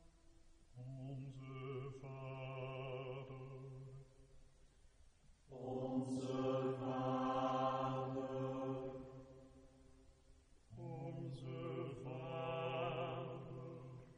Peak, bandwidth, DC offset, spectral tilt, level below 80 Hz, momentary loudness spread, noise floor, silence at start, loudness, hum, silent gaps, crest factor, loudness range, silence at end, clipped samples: -28 dBFS; 10 kHz; under 0.1%; -7.5 dB/octave; -70 dBFS; 16 LU; -67 dBFS; 0 s; -45 LUFS; none; none; 18 dB; 10 LU; 0 s; under 0.1%